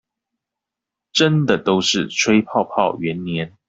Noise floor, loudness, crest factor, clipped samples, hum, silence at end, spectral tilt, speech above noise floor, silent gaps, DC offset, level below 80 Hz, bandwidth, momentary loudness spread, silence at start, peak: -85 dBFS; -18 LUFS; 18 dB; under 0.1%; none; 0.2 s; -4.5 dB/octave; 67 dB; none; under 0.1%; -58 dBFS; 8 kHz; 8 LU; 1.15 s; -2 dBFS